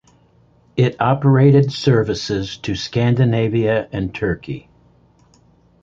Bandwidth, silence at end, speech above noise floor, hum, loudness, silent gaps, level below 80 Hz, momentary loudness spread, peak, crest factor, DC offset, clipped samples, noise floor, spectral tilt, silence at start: 7.6 kHz; 1.25 s; 37 dB; none; -17 LUFS; none; -44 dBFS; 12 LU; -2 dBFS; 16 dB; under 0.1%; under 0.1%; -54 dBFS; -7.5 dB/octave; 0.75 s